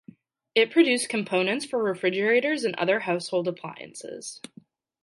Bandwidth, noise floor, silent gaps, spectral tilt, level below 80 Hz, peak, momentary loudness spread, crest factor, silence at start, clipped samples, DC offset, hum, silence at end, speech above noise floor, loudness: 11.5 kHz; -53 dBFS; none; -4 dB/octave; -78 dBFS; -6 dBFS; 17 LU; 20 dB; 0.55 s; under 0.1%; under 0.1%; none; 0.65 s; 27 dB; -24 LUFS